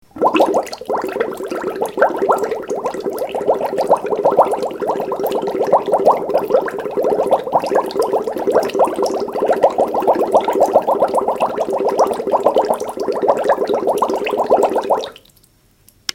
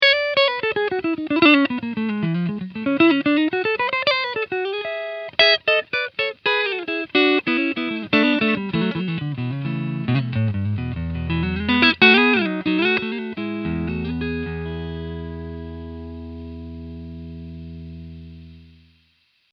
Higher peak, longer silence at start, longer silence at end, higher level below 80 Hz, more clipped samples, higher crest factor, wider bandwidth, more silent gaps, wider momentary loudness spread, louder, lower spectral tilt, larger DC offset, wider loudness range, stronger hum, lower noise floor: about the same, 0 dBFS vs 0 dBFS; first, 0.15 s vs 0 s; about the same, 1 s vs 0.9 s; second, -56 dBFS vs -44 dBFS; neither; second, 16 dB vs 22 dB; first, 17 kHz vs 6.4 kHz; neither; second, 7 LU vs 20 LU; first, -17 LUFS vs -20 LUFS; second, -4.5 dB/octave vs -7 dB/octave; neither; second, 3 LU vs 16 LU; neither; second, -53 dBFS vs -63 dBFS